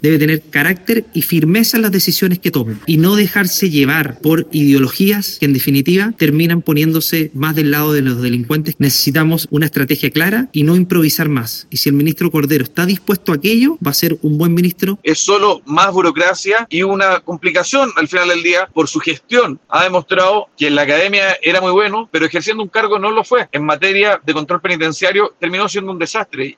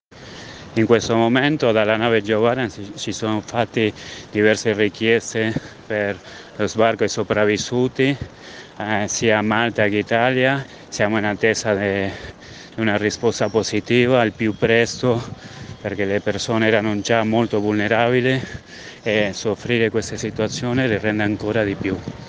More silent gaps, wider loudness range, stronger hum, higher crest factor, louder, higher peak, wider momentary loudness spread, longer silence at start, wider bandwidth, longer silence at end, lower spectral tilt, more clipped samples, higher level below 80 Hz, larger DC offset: neither; about the same, 1 LU vs 2 LU; neither; about the same, 14 dB vs 18 dB; first, -13 LUFS vs -19 LUFS; about the same, 0 dBFS vs 0 dBFS; second, 5 LU vs 13 LU; second, 0 s vs 0.15 s; first, 17.5 kHz vs 10 kHz; about the same, 0.05 s vs 0 s; about the same, -5 dB/octave vs -5 dB/octave; neither; about the same, -54 dBFS vs -50 dBFS; neither